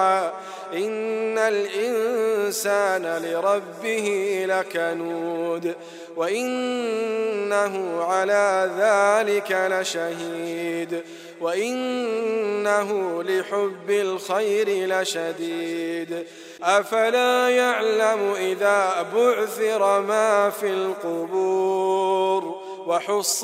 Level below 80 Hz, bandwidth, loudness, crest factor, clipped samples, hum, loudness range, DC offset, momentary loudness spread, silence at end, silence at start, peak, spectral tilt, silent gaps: -84 dBFS; 16 kHz; -23 LUFS; 18 dB; under 0.1%; none; 5 LU; under 0.1%; 9 LU; 0 s; 0 s; -4 dBFS; -3 dB/octave; none